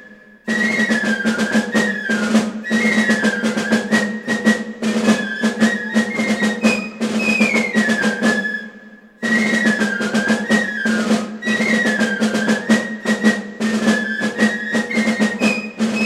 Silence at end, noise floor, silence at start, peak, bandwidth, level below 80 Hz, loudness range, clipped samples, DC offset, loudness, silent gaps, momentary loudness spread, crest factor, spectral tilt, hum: 0 s; -41 dBFS; 0 s; -2 dBFS; 13.5 kHz; -58 dBFS; 1 LU; under 0.1%; under 0.1%; -17 LUFS; none; 5 LU; 16 dB; -4.5 dB/octave; none